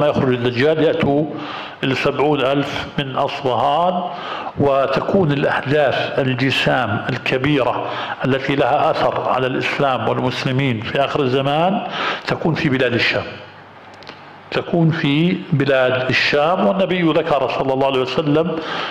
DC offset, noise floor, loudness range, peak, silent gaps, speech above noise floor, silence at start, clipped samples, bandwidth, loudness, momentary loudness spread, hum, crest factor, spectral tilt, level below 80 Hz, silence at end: under 0.1%; -40 dBFS; 3 LU; -6 dBFS; none; 22 dB; 0 s; under 0.1%; 12 kHz; -18 LUFS; 7 LU; none; 12 dB; -6.5 dB/octave; -50 dBFS; 0 s